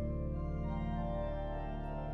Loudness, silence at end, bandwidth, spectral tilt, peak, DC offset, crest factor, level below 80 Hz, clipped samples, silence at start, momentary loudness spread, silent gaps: -40 LUFS; 0 s; 4.5 kHz; -10 dB/octave; -28 dBFS; under 0.1%; 10 dB; -40 dBFS; under 0.1%; 0 s; 3 LU; none